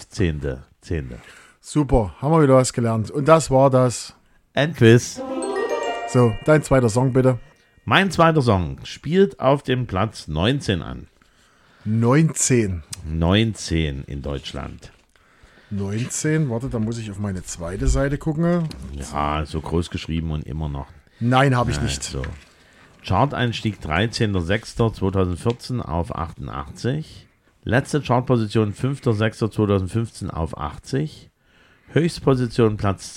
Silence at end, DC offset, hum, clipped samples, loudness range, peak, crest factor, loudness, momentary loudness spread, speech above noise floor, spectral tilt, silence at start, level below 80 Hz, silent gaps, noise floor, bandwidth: 0 s; under 0.1%; none; under 0.1%; 6 LU; 0 dBFS; 20 dB; -21 LUFS; 13 LU; 36 dB; -6 dB/octave; 0 s; -36 dBFS; none; -56 dBFS; 14 kHz